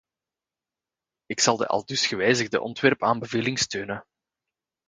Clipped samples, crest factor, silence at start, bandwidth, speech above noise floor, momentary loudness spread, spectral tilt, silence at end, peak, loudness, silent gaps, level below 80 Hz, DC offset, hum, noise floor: under 0.1%; 24 dB; 1.3 s; 10 kHz; 66 dB; 10 LU; -3 dB/octave; 0.85 s; -4 dBFS; -24 LUFS; none; -64 dBFS; under 0.1%; none; -90 dBFS